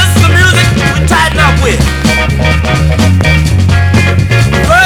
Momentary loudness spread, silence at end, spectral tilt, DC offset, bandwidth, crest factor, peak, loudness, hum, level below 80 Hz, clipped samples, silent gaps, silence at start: 4 LU; 0 s; -5 dB/octave; under 0.1%; 16.5 kHz; 8 dB; 0 dBFS; -8 LUFS; none; -16 dBFS; 2%; none; 0 s